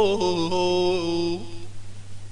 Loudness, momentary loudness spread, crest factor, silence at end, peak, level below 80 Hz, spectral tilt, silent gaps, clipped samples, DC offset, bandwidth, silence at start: -24 LUFS; 21 LU; 14 dB; 0 s; -10 dBFS; -48 dBFS; -5 dB/octave; none; under 0.1%; under 0.1%; 10.5 kHz; 0 s